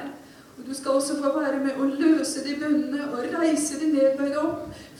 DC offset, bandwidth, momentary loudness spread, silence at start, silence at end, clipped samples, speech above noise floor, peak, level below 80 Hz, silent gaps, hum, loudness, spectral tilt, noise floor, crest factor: under 0.1%; 14.5 kHz; 10 LU; 0 s; 0 s; under 0.1%; 21 dB; -10 dBFS; -62 dBFS; none; none; -24 LUFS; -3.5 dB/octave; -45 dBFS; 14 dB